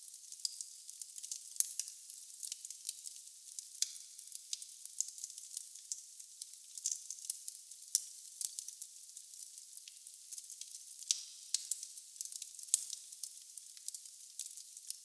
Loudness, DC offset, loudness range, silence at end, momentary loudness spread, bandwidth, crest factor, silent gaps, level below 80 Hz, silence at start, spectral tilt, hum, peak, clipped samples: -42 LUFS; under 0.1%; 4 LU; 0 s; 13 LU; 11 kHz; 38 dB; none; under -90 dBFS; 0 s; 5 dB/octave; none; -8 dBFS; under 0.1%